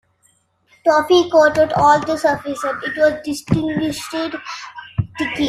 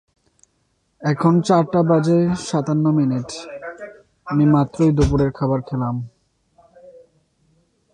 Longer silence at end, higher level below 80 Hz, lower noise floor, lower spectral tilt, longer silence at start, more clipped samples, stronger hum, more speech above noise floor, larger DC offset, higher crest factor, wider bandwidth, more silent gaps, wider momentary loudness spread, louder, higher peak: second, 0 s vs 1.05 s; second, -48 dBFS vs -38 dBFS; second, -60 dBFS vs -66 dBFS; second, -5.5 dB/octave vs -7.5 dB/octave; second, 0.85 s vs 1 s; neither; neither; second, 43 dB vs 49 dB; neither; about the same, 16 dB vs 16 dB; first, 14 kHz vs 10 kHz; neither; second, 13 LU vs 17 LU; about the same, -17 LUFS vs -18 LUFS; about the same, -2 dBFS vs -4 dBFS